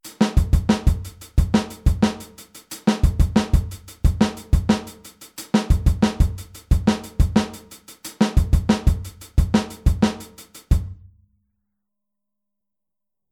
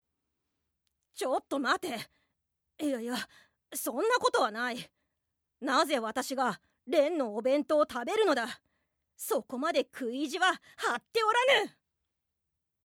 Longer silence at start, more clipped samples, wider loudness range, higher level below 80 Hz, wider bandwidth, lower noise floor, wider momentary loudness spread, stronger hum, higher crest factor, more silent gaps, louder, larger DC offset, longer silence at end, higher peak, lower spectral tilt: second, 0.05 s vs 1.15 s; neither; about the same, 3 LU vs 5 LU; first, -24 dBFS vs -78 dBFS; about the same, 17.5 kHz vs 18 kHz; first, -87 dBFS vs -83 dBFS; first, 18 LU vs 13 LU; neither; about the same, 18 dB vs 20 dB; neither; first, -21 LUFS vs -30 LUFS; neither; first, 2.4 s vs 1.15 s; first, -4 dBFS vs -12 dBFS; first, -6.5 dB/octave vs -2.5 dB/octave